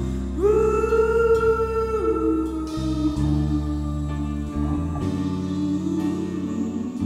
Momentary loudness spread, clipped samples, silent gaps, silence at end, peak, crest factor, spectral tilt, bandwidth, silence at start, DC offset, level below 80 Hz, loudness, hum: 8 LU; under 0.1%; none; 0 s; -8 dBFS; 14 dB; -8 dB/octave; 13 kHz; 0 s; under 0.1%; -32 dBFS; -23 LUFS; none